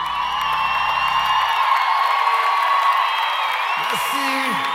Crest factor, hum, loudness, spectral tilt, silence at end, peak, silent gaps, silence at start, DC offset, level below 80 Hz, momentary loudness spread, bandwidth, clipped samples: 14 dB; none; -18 LUFS; -1.5 dB/octave; 0 s; -6 dBFS; none; 0 s; under 0.1%; -54 dBFS; 3 LU; 16.5 kHz; under 0.1%